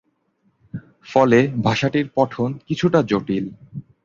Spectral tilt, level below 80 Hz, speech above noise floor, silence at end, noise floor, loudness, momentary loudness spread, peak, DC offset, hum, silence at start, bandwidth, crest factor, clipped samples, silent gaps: -7 dB/octave; -54 dBFS; 47 dB; 0.25 s; -65 dBFS; -19 LUFS; 21 LU; -2 dBFS; under 0.1%; none; 0.75 s; 7.6 kHz; 18 dB; under 0.1%; none